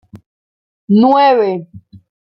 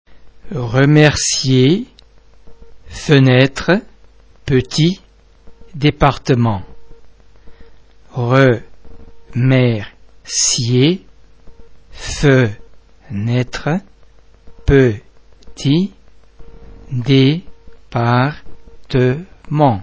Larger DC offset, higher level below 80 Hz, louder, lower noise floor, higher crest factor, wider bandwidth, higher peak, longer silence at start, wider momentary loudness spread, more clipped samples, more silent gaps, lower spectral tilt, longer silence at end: neither; second, -60 dBFS vs -36 dBFS; first, -11 LUFS vs -15 LUFS; first, under -90 dBFS vs -46 dBFS; about the same, 14 dB vs 16 dB; second, 5.8 kHz vs 8 kHz; about the same, -2 dBFS vs 0 dBFS; about the same, 0.15 s vs 0.1 s; second, 10 LU vs 15 LU; neither; first, 0.26-0.88 s vs none; first, -9 dB/octave vs -5.5 dB/octave; first, 0.3 s vs 0 s